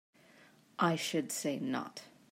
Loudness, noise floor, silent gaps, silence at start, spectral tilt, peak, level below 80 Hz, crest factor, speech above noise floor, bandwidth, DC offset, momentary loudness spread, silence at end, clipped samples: -35 LUFS; -63 dBFS; none; 0.4 s; -4 dB/octave; -18 dBFS; -84 dBFS; 20 dB; 28 dB; 16 kHz; under 0.1%; 17 LU; 0.25 s; under 0.1%